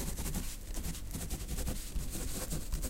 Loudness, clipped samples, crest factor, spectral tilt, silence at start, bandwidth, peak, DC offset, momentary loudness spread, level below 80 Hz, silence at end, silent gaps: -40 LUFS; under 0.1%; 16 dB; -4 dB/octave; 0 s; 17 kHz; -22 dBFS; under 0.1%; 3 LU; -40 dBFS; 0 s; none